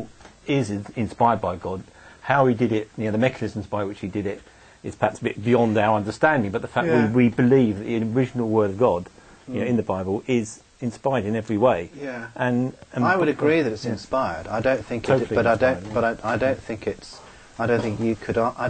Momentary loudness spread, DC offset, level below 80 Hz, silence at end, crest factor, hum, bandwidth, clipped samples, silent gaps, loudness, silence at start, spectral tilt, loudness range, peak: 13 LU; under 0.1%; -52 dBFS; 0 s; 20 dB; none; 9.2 kHz; under 0.1%; none; -23 LUFS; 0 s; -7 dB/octave; 4 LU; -2 dBFS